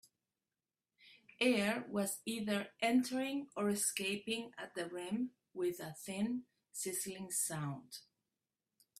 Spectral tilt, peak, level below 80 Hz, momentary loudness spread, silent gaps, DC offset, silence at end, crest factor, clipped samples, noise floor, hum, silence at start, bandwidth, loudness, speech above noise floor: -3.5 dB/octave; -20 dBFS; -80 dBFS; 11 LU; none; under 0.1%; 1 s; 20 dB; under 0.1%; under -90 dBFS; none; 1.05 s; 15.5 kHz; -38 LUFS; over 52 dB